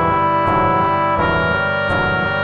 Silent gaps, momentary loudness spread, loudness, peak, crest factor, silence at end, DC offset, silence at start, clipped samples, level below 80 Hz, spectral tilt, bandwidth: none; 2 LU; -16 LUFS; -4 dBFS; 12 dB; 0 s; under 0.1%; 0 s; under 0.1%; -36 dBFS; -8 dB/octave; 6.8 kHz